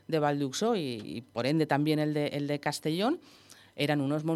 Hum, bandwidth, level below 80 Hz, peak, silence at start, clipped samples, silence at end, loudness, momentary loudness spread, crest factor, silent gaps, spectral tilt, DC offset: none; 14.5 kHz; -76 dBFS; -12 dBFS; 0.1 s; under 0.1%; 0 s; -30 LUFS; 9 LU; 18 dB; none; -5.5 dB/octave; under 0.1%